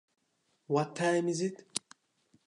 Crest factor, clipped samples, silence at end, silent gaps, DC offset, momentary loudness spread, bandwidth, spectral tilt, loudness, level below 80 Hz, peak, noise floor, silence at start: 24 dB; under 0.1%; 0.7 s; none; under 0.1%; 10 LU; 11.5 kHz; -4.5 dB/octave; -33 LUFS; -84 dBFS; -10 dBFS; -76 dBFS; 0.7 s